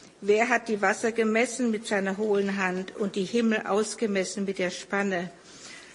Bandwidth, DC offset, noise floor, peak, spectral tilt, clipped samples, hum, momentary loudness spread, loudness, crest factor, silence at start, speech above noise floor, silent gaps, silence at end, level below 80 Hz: 11.5 kHz; under 0.1%; -46 dBFS; -8 dBFS; -4.5 dB/octave; under 0.1%; none; 7 LU; -27 LUFS; 20 dB; 0.05 s; 20 dB; none; 0 s; -70 dBFS